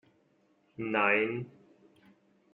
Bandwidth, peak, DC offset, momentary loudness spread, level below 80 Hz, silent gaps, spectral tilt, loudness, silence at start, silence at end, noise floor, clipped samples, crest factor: 4.3 kHz; -12 dBFS; under 0.1%; 22 LU; -76 dBFS; none; -3.5 dB/octave; -30 LUFS; 0.8 s; 1.05 s; -69 dBFS; under 0.1%; 22 dB